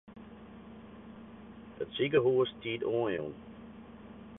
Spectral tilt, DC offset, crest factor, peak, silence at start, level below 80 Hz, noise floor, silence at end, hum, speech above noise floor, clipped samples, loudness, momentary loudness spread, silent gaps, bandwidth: -9.5 dB/octave; under 0.1%; 22 dB; -14 dBFS; 0.1 s; -64 dBFS; -50 dBFS; 0 s; none; 19 dB; under 0.1%; -32 LUFS; 23 LU; none; 3.9 kHz